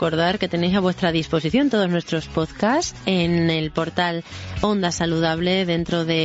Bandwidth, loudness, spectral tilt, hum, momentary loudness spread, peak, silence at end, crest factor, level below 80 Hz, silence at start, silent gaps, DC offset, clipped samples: 8 kHz; -21 LUFS; -5.5 dB/octave; none; 5 LU; -4 dBFS; 0 s; 18 dB; -44 dBFS; 0 s; none; under 0.1%; under 0.1%